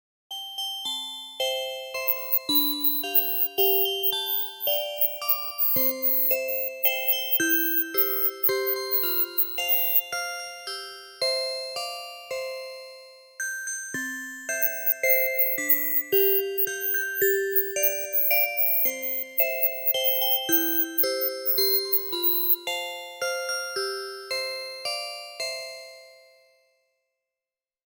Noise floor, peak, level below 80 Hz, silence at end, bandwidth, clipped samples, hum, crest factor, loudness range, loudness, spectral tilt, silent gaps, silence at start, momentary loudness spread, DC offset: under -90 dBFS; -4 dBFS; -72 dBFS; 1.75 s; 19 kHz; under 0.1%; none; 22 dB; 10 LU; -23 LUFS; -0.5 dB/octave; none; 0.3 s; 13 LU; under 0.1%